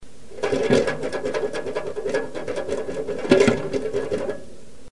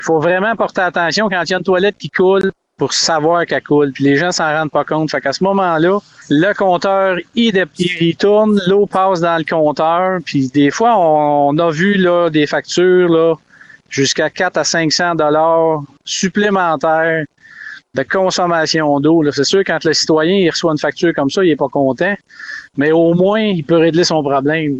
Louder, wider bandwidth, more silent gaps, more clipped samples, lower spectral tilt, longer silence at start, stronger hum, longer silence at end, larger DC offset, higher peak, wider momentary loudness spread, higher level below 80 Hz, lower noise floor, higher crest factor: second, -24 LUFS vs -14 LUFS; first, 11.5 kHz vs 10 kHz; neither; neither; about the same, -5.5 dB/octave vs -4.5 dB/octave; about the same, 0 s vs 0 s; neither; about the same, 0 s vs 0 s; first, 2% vs under 0.1%; about the same, 0 dBFS vs -2 dBFS; first, 12 LU vs 5 LU; about the same, -50 dBFS vs -54 dBFS; first, -44 dBFS vs -34 dBFS; first, 22 dB vs 10 dB